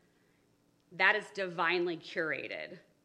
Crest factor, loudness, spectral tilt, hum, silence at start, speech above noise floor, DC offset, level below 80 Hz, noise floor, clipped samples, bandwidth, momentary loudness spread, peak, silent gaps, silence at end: 24 dB; -32 LUFS; -4.5 dB/octave; none; 0.9 s; 37 dB; under 0.1%; -86 dBFS; -71 dBFS; under 0.1%; 10.5 kHz; 15 LU; -12 dBFS; none; 0.25 s